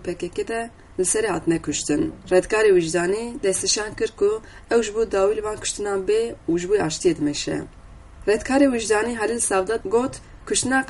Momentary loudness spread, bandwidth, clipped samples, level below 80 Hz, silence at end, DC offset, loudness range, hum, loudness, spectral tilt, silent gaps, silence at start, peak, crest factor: 10 LU; 11.5 kHz; under 0.1%; -46 dBFS; 0 s; under 0.1%; 2 LU; none; -22 LUFS; -3.5 dB/octave; none; 0 s; -4 dBFS; 18 dB